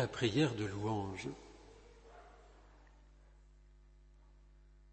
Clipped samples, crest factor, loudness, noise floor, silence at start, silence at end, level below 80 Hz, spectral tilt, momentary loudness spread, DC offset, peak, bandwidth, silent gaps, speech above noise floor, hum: under 0.1%; 22 dB; -37 LUFS; -62 dBFS; 0 s; 2.05 s; -62 dBFS; -6 dB/octave; 27 LU; under 0.1%; -20 dBFS; 8.4 kHz; none; 25 dB; 50 Hz at -60 dBFS